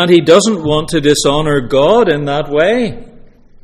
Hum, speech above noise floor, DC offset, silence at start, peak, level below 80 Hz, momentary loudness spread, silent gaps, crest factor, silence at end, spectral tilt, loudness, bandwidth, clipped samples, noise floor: none; 27 dB; under 0.1%; 0 s; 0 dBFS; -34 dBFS; 7 LU; none; 12 dB; 0.55 s; -4.5 dB/octave; -11 LUFS; 14 kHz; 0.2%; -38 dBFS